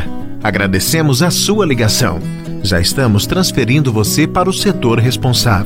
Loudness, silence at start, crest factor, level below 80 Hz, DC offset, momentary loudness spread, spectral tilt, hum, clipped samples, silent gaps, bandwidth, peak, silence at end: -13 LUFS; 0 s; 12 dB; -32 dBFS; under 0.1%; 6 LU; -4.5 dB/octave; none; under 0.1%; none; 16.5 kHz; 0 dBFS; 0 s